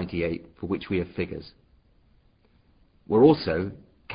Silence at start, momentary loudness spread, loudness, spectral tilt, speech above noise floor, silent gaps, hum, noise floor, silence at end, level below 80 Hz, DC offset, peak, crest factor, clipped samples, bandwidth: 0 s; 16 LU; -25 LUFS; -11 dB/octave; 37 dB; none; none; -62 dBFS; 0 s; -48 dBFS; under 0.1%; -6 dBFS; 22 dB; under 0.1%; 5.2 kHz